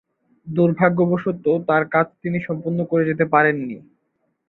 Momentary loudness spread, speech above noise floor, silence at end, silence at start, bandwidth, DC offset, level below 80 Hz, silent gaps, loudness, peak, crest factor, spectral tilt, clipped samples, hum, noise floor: 10 LU; 52 dB; 0.7 s; 0.45 s; 4.2 kHz; under 0.1%; -62 dBFS; none; -20 LUFS; -2 dBFS; 18 dB; -11 dB/octave; under 0.1%; none; -71 dBFS